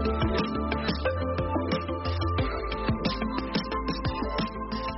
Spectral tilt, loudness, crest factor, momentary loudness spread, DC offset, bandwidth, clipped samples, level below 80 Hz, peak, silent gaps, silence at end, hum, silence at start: -5 dB/octave; -29 LUFS; 16 dB; 3 LU; under 0.1%; 6 kHz; under 0.1%; -36 dBFS; -14 dBFS; none; 0 s; none; 0 s